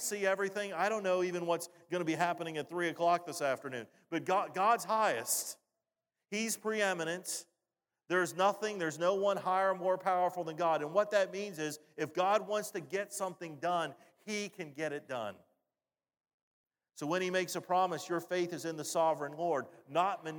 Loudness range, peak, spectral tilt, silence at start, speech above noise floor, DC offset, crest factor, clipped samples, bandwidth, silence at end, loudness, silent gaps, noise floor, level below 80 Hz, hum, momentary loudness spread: 7 LU; -16 dBFS; -3.5 dB/octave; 0 s; over 56 dB; under 0.1%; 20 dB; under 0.1%; 19.5 kHz; 0 s; -34 LUFS; 16.34-16.64 s; under -90 dBFS; under -90 dBFS; none; 9 LU